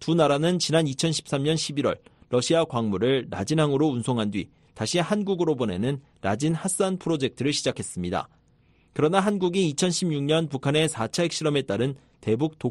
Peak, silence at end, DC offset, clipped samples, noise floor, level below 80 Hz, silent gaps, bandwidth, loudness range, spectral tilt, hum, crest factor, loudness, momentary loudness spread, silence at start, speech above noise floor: -6 dBFS; 0 s; under 0.1%; under 0.1%; -61 dBFS; -58 dBFS; none; 13 kHz; 2 LU; -5 dB/octave; none; 18 dB; -25 LUFS; 8 LU; 0 s; 36 dB